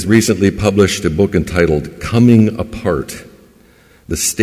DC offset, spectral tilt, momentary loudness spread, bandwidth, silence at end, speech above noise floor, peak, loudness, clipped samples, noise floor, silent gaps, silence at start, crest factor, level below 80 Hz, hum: under 0.1%; -5.5 dB/octave; 11 LU; 16 kHz; 0 s; 34 dB; 0 dBFS; -14 LUFS; under 0.1%; -47 dBFS; none; 0 s; 14 dB; -32 dBFS; none